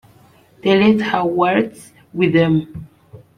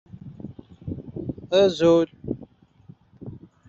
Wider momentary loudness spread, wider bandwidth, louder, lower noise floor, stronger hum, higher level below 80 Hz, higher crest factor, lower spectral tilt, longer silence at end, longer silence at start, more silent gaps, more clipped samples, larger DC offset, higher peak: second, 16 LU vs 23 LU; first, 11.5 kHz vs 7.6 kHz; first, -16 LUFS vs -22 LUFS; about the same, -50 dBFS vs -51 dBFS; neither; about the same, -52 dBFS vs -56 dBFS; about the same, 16 dB vs 18 dB; first, -7.5 dB/octave vs -5.5 dB/octave; about the same, 0.2 s vs 0.3 s; first, 0.65 s vs 0.25 s; neither; neither; neither; first, -2 dBFS vs -8 dBFS